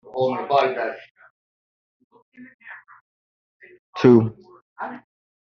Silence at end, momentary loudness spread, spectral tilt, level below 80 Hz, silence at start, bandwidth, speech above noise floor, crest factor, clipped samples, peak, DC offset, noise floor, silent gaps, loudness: 0.45 s; 27 LU; -6 dB/octave; -66 dBFS; 0.15 s; 6.6 kHz; over 72 dB; 22 dB; under 0.1%; -2 dBFS; under 0.1%; under -90 dBFS; 1.11-1.15 s, 1.30-2.10 s, 2.22-2.32 s, 2.54-2.59 s, 3.01-3.60 s, 3.79-3.93 s, 4.62-4.76 s; -19 LUFS